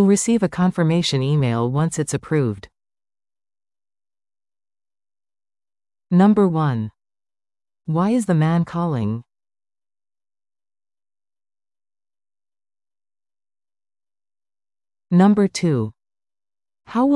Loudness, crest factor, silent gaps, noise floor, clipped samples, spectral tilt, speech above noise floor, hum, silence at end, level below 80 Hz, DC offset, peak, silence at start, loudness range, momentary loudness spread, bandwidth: -19 LUFS; 18 dB; none; under -90 dBFS; under 0.1%; -6.5 dB/octave; over 72 dB; none; 0 s; -58 dBFS; under 0.1%; -4 dBFS; 0 s; 9 LU; 11 LU; 12 kHz